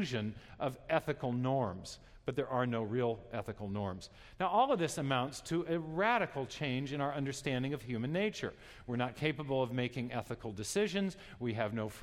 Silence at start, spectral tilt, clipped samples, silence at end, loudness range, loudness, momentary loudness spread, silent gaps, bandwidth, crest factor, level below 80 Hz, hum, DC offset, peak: 0 s; -5.5 dB/octave; under 0.1%; 0 s; 3 LU; -36 LUFS; 10 LU; none; 15.5 kHz; 20 dB; -62 dBFS; none; under 0.1%; -16 dBFS